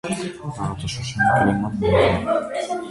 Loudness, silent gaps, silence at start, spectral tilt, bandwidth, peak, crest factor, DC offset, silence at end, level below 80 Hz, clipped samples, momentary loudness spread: -21 LUFS; none; 0.05 s; -5.5 dB/octave; 11.5 kHz; -4 dBFS; 16 dB; under 0.1%; 0 s; -40 dBFS; under 0.1%; 11 LU